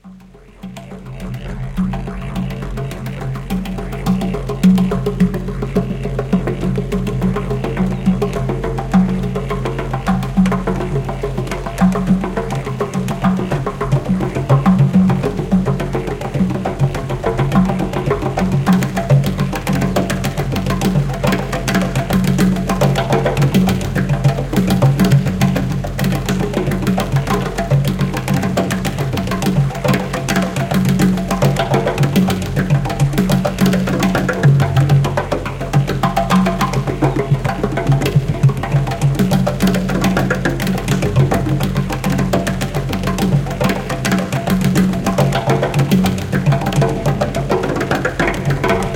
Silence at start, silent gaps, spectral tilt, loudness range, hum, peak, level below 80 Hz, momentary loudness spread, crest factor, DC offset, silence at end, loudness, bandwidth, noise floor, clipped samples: 0.05 s; none; -6.5 dB/octave; 3 LU; none; -2 dBFS; -30 dBFS; 7 LU; 14 dB; under 0.1%; 0 s; -17 LUFS; 17 kHz; -40 dBFS; under 0.1%